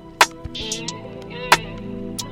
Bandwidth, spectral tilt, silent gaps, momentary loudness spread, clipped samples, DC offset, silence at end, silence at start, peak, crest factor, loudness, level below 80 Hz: 19 kHz; -2 dB/octave; none; 14 LU; under 0.1%; under 0.1%; 0 s; 0 s; -2 dBFS; 22 dB; -22 LUFS; -44 dBFS